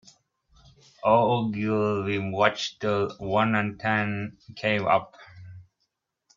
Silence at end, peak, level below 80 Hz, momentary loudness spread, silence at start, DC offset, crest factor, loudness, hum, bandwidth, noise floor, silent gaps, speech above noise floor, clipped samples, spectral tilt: 0.75 s; -4 dBFS; -62 dBFS; 9 LU; 1.05 s; under 0.1%; 24 dB; -25 LUFS; none; 7.4 kHz; -78 dBFS; none; 53 dB; under 0.1%; -6 dB/octave